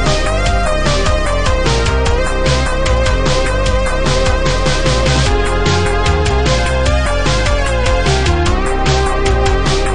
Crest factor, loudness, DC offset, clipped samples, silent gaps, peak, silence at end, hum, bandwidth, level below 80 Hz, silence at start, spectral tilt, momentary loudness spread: 12 dB; -14 LUFS; 5%; under 0.1%; none; -2 dBFS; 0 s; none; 10.5 kHz; -16 dBFS; 0 s; -4.5 dB/octave; 2 LU